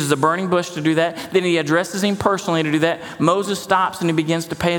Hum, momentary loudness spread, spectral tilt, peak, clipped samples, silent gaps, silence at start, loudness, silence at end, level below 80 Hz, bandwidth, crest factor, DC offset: none; 3 LU; -5 dB/octave; 0 dBFS; under 0.1%; none; 0 s; -19 LUFS; 0 s; -54 dBFS; 18.5 kHz; 18 dB; under 0.1%